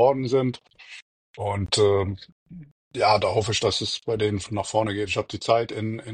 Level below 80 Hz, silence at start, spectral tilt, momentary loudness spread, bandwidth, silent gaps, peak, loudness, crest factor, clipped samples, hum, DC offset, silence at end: -54 dBFS; 0 s; -4.5 dB/octave; 20 LU; 10 kHz; 1.02-1.34 s, 2.32-2.46 s, 2.71-2.91 s; -6 dBFS; -24 LUFS; 18 dB; under 0.1%; none; under 0.1%; 0 s